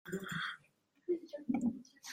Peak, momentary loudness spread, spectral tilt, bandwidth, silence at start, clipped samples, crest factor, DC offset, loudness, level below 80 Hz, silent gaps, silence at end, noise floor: -24 dBFS; 13 LU; -5 dB/octave; 16 kHz; 0.05 s; under 0.1%; 18 dB; under 0.1%; -40 LUFS; -76 dBFS; none; 0 s; -73 dBFS